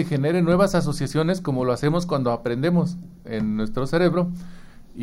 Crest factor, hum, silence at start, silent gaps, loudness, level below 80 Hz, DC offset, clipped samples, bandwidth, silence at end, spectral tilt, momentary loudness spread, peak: 16 dB; none; 0 s; none; -22 LUFS; -42 dBFS; under 0.1%; under 0.1%; 12.5 kHz; 0 s; -7 dB/octave; 9 LU; -6 dBFS